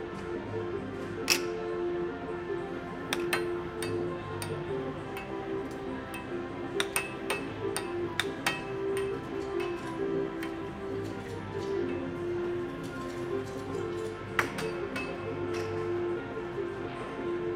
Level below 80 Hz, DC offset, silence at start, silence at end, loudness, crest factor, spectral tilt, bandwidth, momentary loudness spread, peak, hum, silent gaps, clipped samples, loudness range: -56 dBFS; under 0.1%; 0 s; 0 s; -34 LUFS; 26 dB; -4.5 dB/octave; 16 kHz; 7 LU; -8 dBFS; none; none; under 0.1%; 3 LU